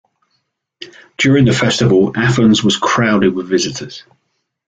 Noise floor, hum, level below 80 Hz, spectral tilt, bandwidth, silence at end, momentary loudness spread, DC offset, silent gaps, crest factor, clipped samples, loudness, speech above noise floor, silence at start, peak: -69 dBFS; none; -46 dBFS; -5 dB/octave; 9.2 kHz; 0.7 s; 20 LU; under 0.1%; none; 14 dB; under 0.1%; -13 LUFS; 56 dB; 0.8 s; -2 dBFS